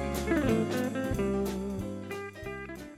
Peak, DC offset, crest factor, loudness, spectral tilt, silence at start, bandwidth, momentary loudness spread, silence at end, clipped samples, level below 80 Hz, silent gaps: -16 dBFS; under 0.1%; 16 dB; -32 LUFS; -6 dB/octave; 0 s; 16 kHz; 12 LU; 0 s; under 0.1%; -44 dBFS; none